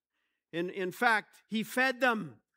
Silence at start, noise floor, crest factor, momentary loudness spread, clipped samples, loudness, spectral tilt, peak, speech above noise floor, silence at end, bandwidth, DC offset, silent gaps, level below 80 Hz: 0.55 s; -83 dBFS; 20 dB; 10 LU; under 0.1%; -31 LUFS; -4 dB/octave; -12 dBFS; 52 dB; 0.25 s; 16 kHz; under 0.1%; none; -88 dBFS